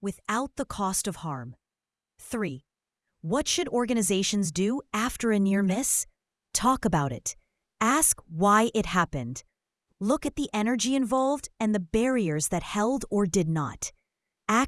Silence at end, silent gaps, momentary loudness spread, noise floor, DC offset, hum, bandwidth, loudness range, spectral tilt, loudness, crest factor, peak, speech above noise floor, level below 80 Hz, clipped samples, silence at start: 0 s; none; 13 LU; under -90 dBFS; under 0.1%; none; 12 kHz; 5 LU; -4 dB/octave; -27 LUFS; 20 dB; -6 dBFS; over 64 dB; -52 dBFS; under 0.1%; 0 s